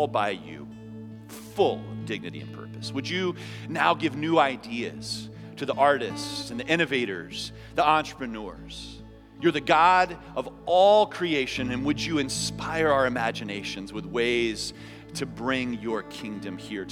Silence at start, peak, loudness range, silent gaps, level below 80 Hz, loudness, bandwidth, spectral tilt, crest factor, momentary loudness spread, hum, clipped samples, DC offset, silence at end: 0 s; -4 dBFS; 7 LU; none; -54 dBFS; -26 LUFS; 16.5 kHz; -4.5 dB/octave; 22 dB; 17 LU; none; under 0.1%; under 0.1%; 0 s